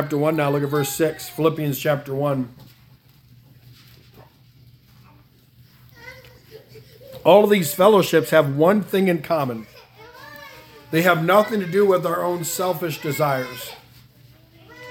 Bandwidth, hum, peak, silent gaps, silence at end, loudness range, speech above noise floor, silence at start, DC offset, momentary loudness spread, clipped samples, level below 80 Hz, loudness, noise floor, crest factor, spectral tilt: 18 kHz; none; 0 dBFS; none; 0 s; 10 LU; 33 dB; 0 s; under 0.1%; 23 LU; under 0.1%; -62 dBFS; -19 LUFS; -52 dBFS; 22 dB; -5.5 dB/octave